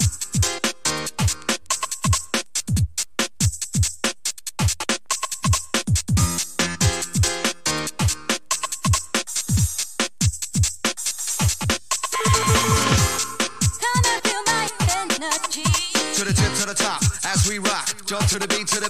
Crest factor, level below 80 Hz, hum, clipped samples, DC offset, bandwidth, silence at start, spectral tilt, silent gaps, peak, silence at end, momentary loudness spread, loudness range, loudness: 18 dB; -34 dBFS; none; under 0.1%; 1%; 16 kHz; 0 s; -3 dB/octave; none; -4 dBFS; 0 s; 5 LU; 3 LU; -21 LUFS